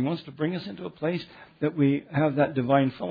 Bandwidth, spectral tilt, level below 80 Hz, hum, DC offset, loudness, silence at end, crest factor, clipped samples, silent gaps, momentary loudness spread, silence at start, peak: 5 kHz; -10 dB/octave; -66 dBFS; none; under 0.1%; -26 LUFS; 0 s; 18 dB; under 0.1%; none; 11 LU; 0 s; -8 dBFS